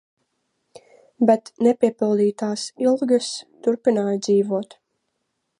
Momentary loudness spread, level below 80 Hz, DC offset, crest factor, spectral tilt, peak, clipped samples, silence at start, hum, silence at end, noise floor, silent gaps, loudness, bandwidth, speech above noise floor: 8 LU; -76 dBFS; under 0.1%; 18 dB; -5.5 dB/octave; -4 dBFS; under 0.1%; 1.2 s; none; 0.95 s; -75 dBFS; none; -21 LUFS; 11 kHz; 55 dB